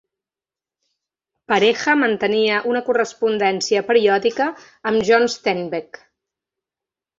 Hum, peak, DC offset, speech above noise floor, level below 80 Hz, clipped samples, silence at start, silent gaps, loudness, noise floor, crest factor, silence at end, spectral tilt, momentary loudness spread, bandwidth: none; -2 dBFS; under 0.1%; over 72 dB; -64 dBFS; under 0.1%; 1.5 s; none; -18 LUFS; under -90 dBFS; 18 dB; 1.4 s; -3.5 dB/octave; 8 LU; 7.8 kHz